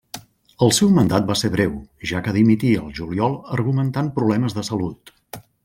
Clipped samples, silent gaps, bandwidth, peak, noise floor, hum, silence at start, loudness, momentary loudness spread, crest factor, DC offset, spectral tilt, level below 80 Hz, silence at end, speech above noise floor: under 0.1%; none; 16.5 kHz; -2 dBFS; -40 dBFS; none; 0.15 s; -20 LUFS; 14 LU; 18 dB; under 0.1%; -5.5 dB/octave; -48 dBFS; 0.25 s; 21 dB